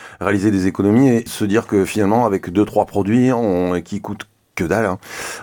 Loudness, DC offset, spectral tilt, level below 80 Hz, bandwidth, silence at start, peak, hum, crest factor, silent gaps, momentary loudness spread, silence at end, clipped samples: -17 LUFS; under 0.1%; -6.5 dB/octave; -48 dBFS; 19 kHz; 0 s; -2 dBFS; none; 16 dB; none; 13 LU; 0 s; under 0.1%